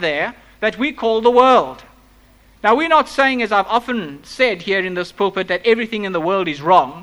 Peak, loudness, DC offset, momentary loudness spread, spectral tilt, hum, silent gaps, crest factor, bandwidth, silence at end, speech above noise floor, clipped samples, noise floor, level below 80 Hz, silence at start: 0 dBFS; -17 LUFS; under 0.1%; 9 LU; -5 dB/octave; none; none; 16 dB; 12.5 kHz; 0 s; 33 dB; under 0.1%; -49 dBFS; -52 dBFS; 0 s